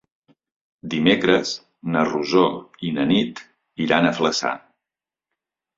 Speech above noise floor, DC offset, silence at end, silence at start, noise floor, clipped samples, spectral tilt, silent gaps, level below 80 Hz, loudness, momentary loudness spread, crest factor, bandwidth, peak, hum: 68 dB; under 0.1%; 1.2 s; 0.85 s; -89 dBFS; under 0.1%; -5 dB/octave; none; -60 dBFS; -21 LUFS; 12 LU; 20 dB; 7.8 kHz; -2 dBFS; none